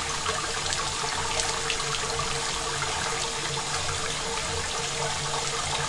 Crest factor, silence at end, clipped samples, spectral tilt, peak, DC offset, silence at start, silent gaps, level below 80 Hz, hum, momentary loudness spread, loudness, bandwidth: 20 dB; 0 s; under 0.1%; -1.5 dB/octave; -10 dBFS; under 0.1%; 0 s; none; -44 dBFS; none; 2 LU; -27 LUFS; 11.5 kHz